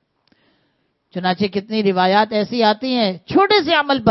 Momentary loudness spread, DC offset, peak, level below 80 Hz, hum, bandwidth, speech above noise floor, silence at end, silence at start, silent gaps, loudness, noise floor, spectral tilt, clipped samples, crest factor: 7 LU; under 0.1%; 0 dBFS; -58 dBFS; none; 6 kHz; 49 dB; 0 s; 1.15 s; none; -17 LUFS; -66 dBFS; -7 dB/octave; under 0.1%; 18 dB